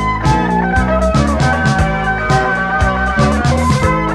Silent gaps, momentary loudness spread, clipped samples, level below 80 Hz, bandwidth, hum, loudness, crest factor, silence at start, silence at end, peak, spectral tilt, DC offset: none; 1 LU; under 0.1%; -22 dBFS; 12.5 kHz; none; -14 LUFS; 12 dB; 0 s; 0 s; 0 dBFS; -6 dB/octave; under 0.1%